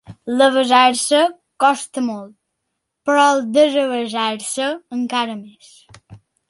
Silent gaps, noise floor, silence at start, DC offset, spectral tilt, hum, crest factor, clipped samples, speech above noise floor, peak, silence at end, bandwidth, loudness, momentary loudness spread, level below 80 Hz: none; -76 dBFS; 0.1 s; under 0.1%; -2.5 dB/octave; none; 16 dB; under 0.1%; 59 dB; -2 dBFS; 0.35 s; 11.5 kHz; -17 LUFS; 12 LU; -64 dBFS